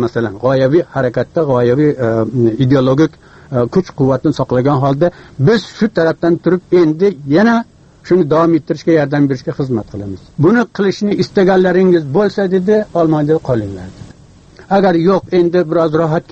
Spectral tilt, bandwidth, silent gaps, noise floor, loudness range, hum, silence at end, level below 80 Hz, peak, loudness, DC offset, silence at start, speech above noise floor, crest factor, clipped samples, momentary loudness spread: -8 dB/octave; 8 kHz; none; -41 dBFS; 2 LU; none; 0.1 s; -44 dBFS; 0 dBFS; -13 LUFS; under 0.1%; 0 s; 28 dB; 12 dB; under 0.1%; 7 LU